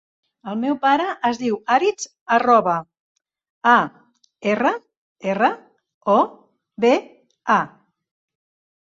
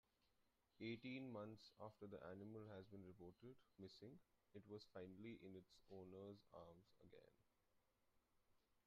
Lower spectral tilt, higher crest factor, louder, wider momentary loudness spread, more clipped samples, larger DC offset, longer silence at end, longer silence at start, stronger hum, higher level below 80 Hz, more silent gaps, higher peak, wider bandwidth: about the same, -4.5 dB/octave vs -5.5 dB/octave; about the same, 18 dB vs 20 dB; first, -20 LUFS vs -60 LUFS; first, 14 LU vs 11 LU; neither; neither; first, 1.15 s vs 0.05 s; first, 0.45 s vs 0.3 s; neither; first, -68 dBFS vs -88 dBFS; first, 2.21-2.26 s, 3.00-3.15 s, 3.50-3.61 s, 4.97-5.15 s, 5.94-6.01 s vs none; first, -2 dBFS vs -42 dBFS; first, 8 kHz vs 7 kHz